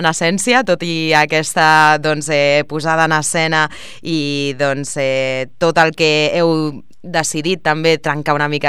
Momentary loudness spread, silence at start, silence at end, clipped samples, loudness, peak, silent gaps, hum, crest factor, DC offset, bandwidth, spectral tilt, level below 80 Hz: 7 LU; 0 s; 0 s; under 0.1%; -15 LUFS; 0 dBFS; none; none; 16 dB; 2%; 15.5 kHz; -4 dB/octave; -54 dBFS